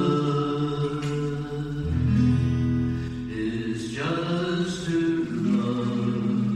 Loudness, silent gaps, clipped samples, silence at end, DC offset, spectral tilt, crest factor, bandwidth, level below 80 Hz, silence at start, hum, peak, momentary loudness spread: -26 LUFS; none; under 0.1%; 0 s; under 0.1%; -7.5 dB/octave; 14 dB; 10 kHz; -42 dBFS; 0 s; none; -12 dBFS; 8 LU